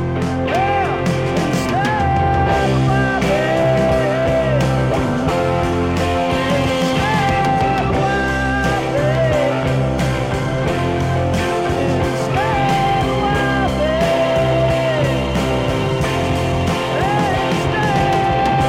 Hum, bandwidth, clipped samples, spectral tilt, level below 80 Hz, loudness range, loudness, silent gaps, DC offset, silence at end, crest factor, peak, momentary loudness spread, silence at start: none; 15 kHz; under 0.1%; -6 dB/octave; -30 dBFS; 2 LU; -17 LUFS; none; under 0.1%; 0 s; 14 dB; -2 dBFS; 3 LU; 0 s